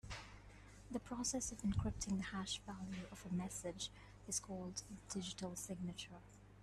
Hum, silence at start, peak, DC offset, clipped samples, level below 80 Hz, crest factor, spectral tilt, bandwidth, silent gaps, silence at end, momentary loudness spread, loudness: 50 Hz at -60 dBFS; 0.05 s; -28 dBFS; under 0.1%; under 0.1%; -58 dBFS; 18 dB; -4 dB/octave; 13.5 kHz; none; 0 s; 16 LU; -45 LUFS